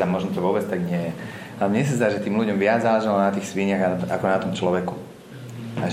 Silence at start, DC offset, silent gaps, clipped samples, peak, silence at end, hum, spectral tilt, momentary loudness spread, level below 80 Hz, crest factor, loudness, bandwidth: 0 s; under 0.1%; none; under 0.1%; -4 dBFS; 0 s; none; -6.5 dB/octave; 15 LU; -62 dBFS; 18 dB; -23 LUFS; 15.5 kHz